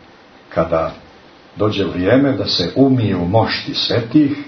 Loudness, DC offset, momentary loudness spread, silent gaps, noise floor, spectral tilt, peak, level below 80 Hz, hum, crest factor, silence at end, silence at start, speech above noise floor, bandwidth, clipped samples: -16 LUFS; under 0.1%; 7 LU; none; -44 dBFS; -7 dB/octave; 0 dBFS; -46 dBFS; none; 16 dB; 0 s; 0.5 s; 29 dB; 6.4 kHz; under 0.1%